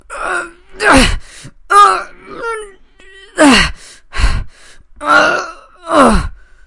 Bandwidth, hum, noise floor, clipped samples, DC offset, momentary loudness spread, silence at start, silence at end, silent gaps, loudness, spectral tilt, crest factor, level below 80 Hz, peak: 12 kHz; none; -40 dBFS; 0.2%; under 0.1%; 19 LU; 0.1 s; 0.35 s; none; -11 LUFS; -4 dB/octave; 14 dB; -24 dBFS; 0 dBFS